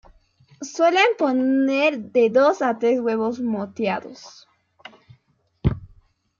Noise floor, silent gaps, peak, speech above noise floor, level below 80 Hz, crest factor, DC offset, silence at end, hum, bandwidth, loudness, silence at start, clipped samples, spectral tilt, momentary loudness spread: -64 dBFS; none; -4 dBFS; 44 dB; -44 dBFS; 18 dB; under 0.1%; 0.55 s; none; 7.4 kHz; -20 LUFS; 0.6 s; under 0.1%; -6 dB/octave; 16 LU